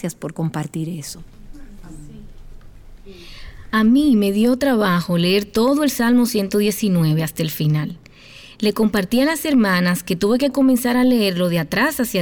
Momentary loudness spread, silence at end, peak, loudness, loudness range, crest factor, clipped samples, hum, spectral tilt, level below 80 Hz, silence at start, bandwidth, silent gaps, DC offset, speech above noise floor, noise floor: 11 LU; 0 s; -8 dBFS; -18 LUFS; 9 LU; 10 dB; under 0.1%; none; -5.5 dB/octave; -44 dBFS; 0 s; over 20 kHz; none; under 0.1%; 25 dB; -42 dBFS